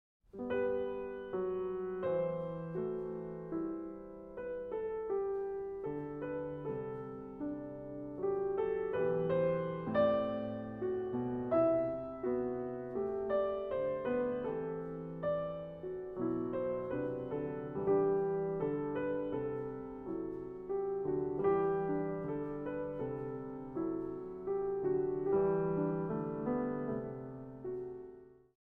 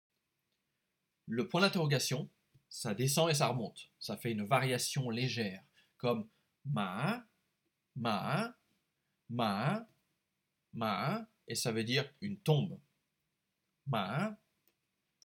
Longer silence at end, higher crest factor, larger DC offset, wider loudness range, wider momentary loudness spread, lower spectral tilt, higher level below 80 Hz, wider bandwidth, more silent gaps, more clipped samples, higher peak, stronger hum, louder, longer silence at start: second, 0.4 s vs 0.95 s; second, 16 dB vs 22 dB; neither; about the same, 5 LU vs 5 LU; second, 11 LU vs 14 LU; first, -10.5 dB/octave vs -4.5 dB/octave; first, -62 dBFS vs -82 dBFS; second, 4 kHz vs 19.5 kHz; neither; neither; second, -20 dBFS vs -14 dBFS; neither; about the same, -37 LUFS vs -35 LUFS; second, 0.35 s vs 1.25 s